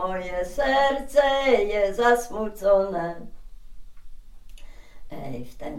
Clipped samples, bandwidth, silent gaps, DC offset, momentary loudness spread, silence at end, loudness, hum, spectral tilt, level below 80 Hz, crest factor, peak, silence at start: under 0.1%; 16 kHz; none; under 0.1%; 17 LU; 0 s; -23 LUFS; none; -4 dB/octave; -42 dBFS; 18 dB; -6 dBFS; 0 s